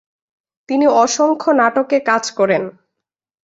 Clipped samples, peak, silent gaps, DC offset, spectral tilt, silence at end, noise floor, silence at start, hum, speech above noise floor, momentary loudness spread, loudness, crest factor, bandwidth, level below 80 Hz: under 0.1%; -2 dBFS; none; under 0.1%; -3.5 dB/octave; 0.75 s; -81 dBFS; 0.7 s; none; 66 dB; 6 LU; -15 LUFS; 16 dB; 8 kHz; -64 dBFS